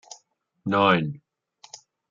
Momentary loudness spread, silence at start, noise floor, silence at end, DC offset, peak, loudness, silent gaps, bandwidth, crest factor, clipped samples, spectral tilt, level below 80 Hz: 25 LU; 0.65 s; -63 dBFS; 0.95 s; under 0.1%; -4 dBFS; -22 LUFS; none; 7.6 kHz; 22 dB; under 0.1%; -5.5 dB/octave; -66 dBFS